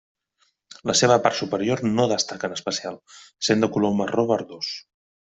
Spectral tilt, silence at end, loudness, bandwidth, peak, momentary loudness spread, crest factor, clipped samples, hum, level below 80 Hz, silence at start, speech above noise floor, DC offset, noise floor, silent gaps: -4 dB/octave; 0.5 s; -22 LUFS; 8.2 kHz; -2 dBFS; 12 LU; 20 dB; under 0.1%; none; -62 dBFS; 0.85 s; 46 dB; under 0.1%; -68 dBFS; none